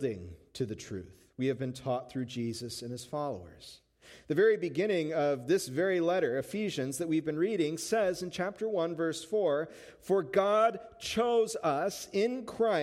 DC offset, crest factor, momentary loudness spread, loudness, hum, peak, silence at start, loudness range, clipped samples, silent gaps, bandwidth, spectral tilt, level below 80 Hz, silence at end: under 0.1%; 16 dB; 12 LU; -32 LUFS; none; -14 dBFS; 0 s; 7 LU; under 0.1%; none; 16 kHz; -5 dB/octave; -68 dBFS; 0 s